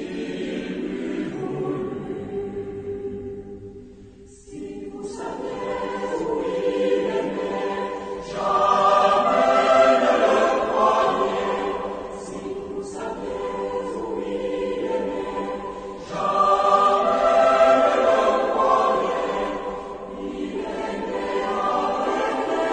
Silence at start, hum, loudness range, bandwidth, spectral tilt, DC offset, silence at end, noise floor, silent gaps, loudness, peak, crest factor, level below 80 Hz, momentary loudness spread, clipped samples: 0 s; none; 13 LU; 9.2 kHz; -5 dB/octave; under 0.1%; 0 s; -45 dBFS; none; -22 LUFS; -6 dBFS; 18 dB; -52 dBFS; 15 LU; under 0.1%